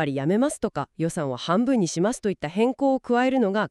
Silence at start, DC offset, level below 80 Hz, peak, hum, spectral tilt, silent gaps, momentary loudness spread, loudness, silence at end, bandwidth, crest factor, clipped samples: 0 s; under 0.1%; -58 dBFS; -10 dBFS; none; -5.5 dB/octave; none; 7 LU; -24 LUFS; 0 s; 12.5 kHz; 14 dB; under 0.1%